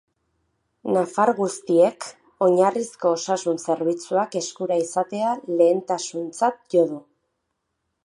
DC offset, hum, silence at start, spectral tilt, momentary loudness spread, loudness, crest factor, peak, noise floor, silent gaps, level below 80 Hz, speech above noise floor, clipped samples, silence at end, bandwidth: under 0.1%; none; 0.85 s; -5 dB/octave; 8 LU; -22 LUFS; 18 dB; -6 dBFS; -77 dBFS; none; -76 dBFS; 55 dB; under 0.1%; 1.05 s; 11.5 kHz